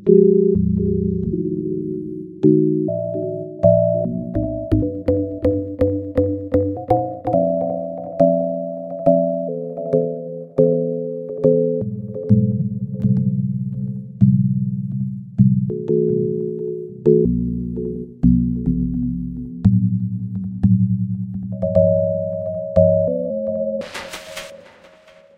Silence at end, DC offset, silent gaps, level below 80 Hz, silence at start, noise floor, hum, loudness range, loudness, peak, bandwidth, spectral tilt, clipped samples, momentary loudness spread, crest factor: 0.8 s; under 0.1%; none; -38 dBFS; 0 s; -48 dBFS; none; 2 LU; -20 LUFS; 0 dBFS; 10 kHz; -10 dB/octave; under 0.1%; 11 LU; 18 dB